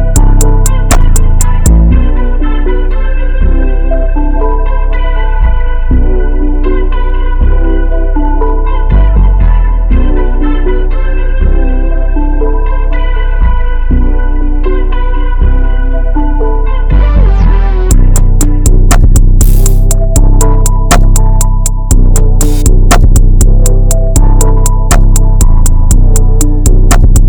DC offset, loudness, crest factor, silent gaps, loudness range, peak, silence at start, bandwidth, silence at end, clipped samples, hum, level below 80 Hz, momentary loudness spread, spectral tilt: under 0.1%; -11 LUFS; 4 dB; none; 4 LU; 0 dBFS; 0 s; 17 kHz; 0 s; 0.3%; none; -6 dBFS; 6 LU; -5.5 dB/octave